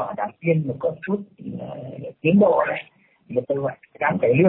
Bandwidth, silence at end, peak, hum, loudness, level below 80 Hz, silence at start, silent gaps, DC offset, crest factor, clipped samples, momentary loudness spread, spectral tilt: 4 kHz; 0 s; -6 dBFS; none; -23 LUFS; -62 dBFS; 0 s; none; under 0.1%; 16 dB; under 0.1%; 17 LU; -12 dB/octave